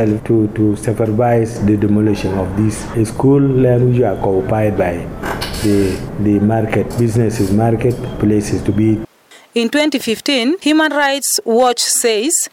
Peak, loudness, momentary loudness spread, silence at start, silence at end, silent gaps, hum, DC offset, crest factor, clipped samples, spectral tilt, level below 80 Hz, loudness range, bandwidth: -4 dBFS; -15 LUFS; 6 LU; 0 s; 0.05 s; none; none; under 0.1%; 10 dB; under 0.1%; -5 dB/octave; -36 dBFS; 2 LU; 17 kHz